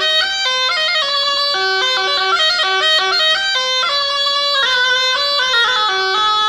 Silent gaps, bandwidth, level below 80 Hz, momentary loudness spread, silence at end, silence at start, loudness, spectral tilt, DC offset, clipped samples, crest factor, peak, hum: none; 15.5 kHz; -54 dBFS; 2 LU; 0 s; 0 s; -13 LUFS; 1 dB/octave; under 0.1%; under 0.1%; 10 dB; -6 dBFS; none